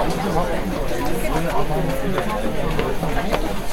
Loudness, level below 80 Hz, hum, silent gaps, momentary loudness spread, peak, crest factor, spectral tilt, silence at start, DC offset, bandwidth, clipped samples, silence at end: -23 LUFS; -26 dBFS; none; none; 2 LU; -4 dBFS; 16 dB; -5.5 dB/octave; 0 s; under 0.1%; 17 kHz; under 0.1%; 0 s